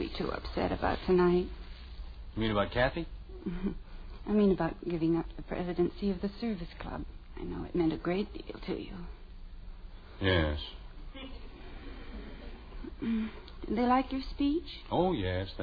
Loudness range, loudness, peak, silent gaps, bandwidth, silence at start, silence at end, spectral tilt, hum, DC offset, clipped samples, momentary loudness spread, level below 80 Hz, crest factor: 5 LU; -32 LUFS; -14 dBFS; none; 5 kHz; 0 s; 0 s; -9 dB/octave; none; under 0.1%; under 0.1%; 20 LU; -44 dBFS; 18 dB